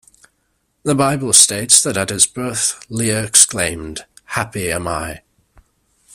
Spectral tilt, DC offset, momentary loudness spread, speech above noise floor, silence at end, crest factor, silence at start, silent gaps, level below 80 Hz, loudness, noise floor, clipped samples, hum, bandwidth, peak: -2 dB/octave; under 0.1%; 16 LU; 50 dB; 0.95 s; 18 dB; 0.85 s; none; -46 dBFS; -14 LUFS; -66 dBFS; 0.1%; none; over 20 kHz; 0 dBFS